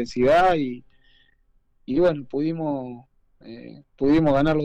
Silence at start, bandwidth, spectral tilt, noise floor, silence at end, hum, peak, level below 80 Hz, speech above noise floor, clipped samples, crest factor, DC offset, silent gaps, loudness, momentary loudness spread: 0 s; 8.8 kHz; -7.5 dB/octave; -62 dBFS; 0 s; none; -12 dBFS; -46 dBFS; 41 dB; under 0.1%; 12 dB; under 0.1%; none; -22 LUFS; 24 LU